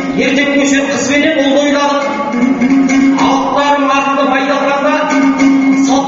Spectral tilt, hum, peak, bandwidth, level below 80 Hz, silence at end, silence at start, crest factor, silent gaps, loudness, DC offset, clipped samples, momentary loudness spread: -2.5 dB/octave; none; 0 dBFS; 8 kHz; -46 dBFS; 0 s; 0 s; 10 dB; none; -11 LUFS; under 0.1%; under 0.1%; 3 LU